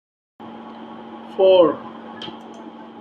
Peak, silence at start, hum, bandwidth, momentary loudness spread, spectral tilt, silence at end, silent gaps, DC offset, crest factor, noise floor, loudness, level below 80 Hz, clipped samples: -2 dBFS; 0.4 s; none; 5.8 kHz; 24 LU; -6.5 dB/octave; 0.3 s; none; under 0.1%; 20 dB; -38 dBFS; -16 LUFS; -70 dBFS; under 0.1%